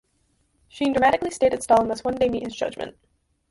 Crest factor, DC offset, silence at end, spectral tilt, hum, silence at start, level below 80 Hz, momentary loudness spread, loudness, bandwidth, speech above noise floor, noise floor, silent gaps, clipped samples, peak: 18 dB; under 0.1%; 0.6 s; -4.5 dB/octave; none; 0.75 s; -52 dBFS; 10 LU; -22 LUFS; 11.5 kHz; 45 dB; -67 dBFS; none; under 0.1%; -6 dBFS